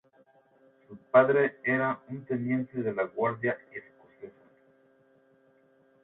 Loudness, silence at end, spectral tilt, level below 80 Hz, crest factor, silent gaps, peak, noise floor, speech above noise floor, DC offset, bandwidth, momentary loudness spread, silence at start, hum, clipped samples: -28 LUFS; 1.75 s; -11 dB/octave; -74 dBFS; 24 dB; none; -8 dBFS; -64 dBFS; 36 dB; under 0.1%; 4 kHz; 25 LU; 0.9 s; none; under 0.1%